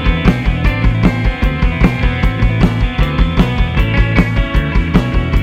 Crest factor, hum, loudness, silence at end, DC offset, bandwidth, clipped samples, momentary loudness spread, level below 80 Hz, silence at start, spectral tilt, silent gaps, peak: 12 dB; none; -14 LUFS; 0 s; under 0.1%; 7.8 kHz; under 0.1%; 3 LU; -16 dBFS; 0 s; -7.5 dB/octave; none; 0 dBFS